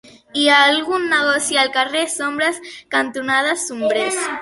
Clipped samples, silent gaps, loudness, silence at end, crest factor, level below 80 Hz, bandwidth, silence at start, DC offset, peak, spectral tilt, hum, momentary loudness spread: under 0.1%; none; -17 LUFS; 0 s; 18 dB; -62 dBFS; 12 kHz; 0.35 s; under 0.1%; 0 dBFS; -1 dB/octave; none; 8 LU